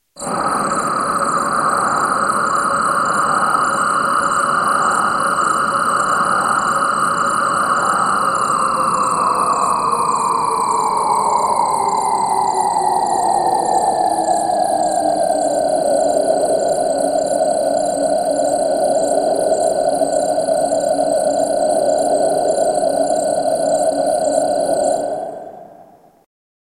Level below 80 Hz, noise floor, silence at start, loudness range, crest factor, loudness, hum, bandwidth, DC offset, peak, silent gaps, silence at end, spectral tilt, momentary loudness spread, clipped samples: -52 dBFS; -45 dBFS; 0.15 s; 1 LU; 14 dB; -16 LUFS; none; 13.5 kHz; under 0.1%; -2 dBFS; none; 0.9 s; -3 dB/octave; 2 LU; under 0.1%